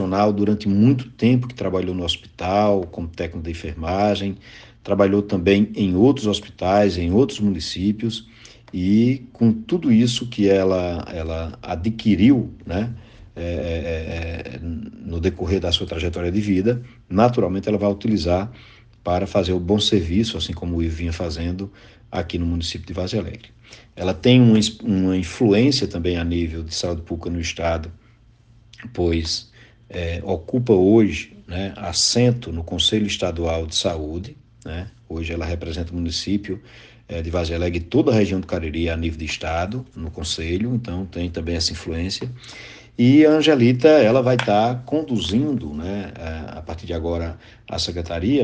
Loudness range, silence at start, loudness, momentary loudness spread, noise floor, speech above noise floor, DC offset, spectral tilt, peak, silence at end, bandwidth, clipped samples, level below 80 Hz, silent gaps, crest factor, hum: 8 LU; 0 s; -21 LUFS; 15 LU; -52 dBFS; 32 dB; under 0.1%; -6 dB/octave; 0 dBFS; 0 s; 9.8 kHz; under 0.1%; -42 dBFS; none; 20 dB; none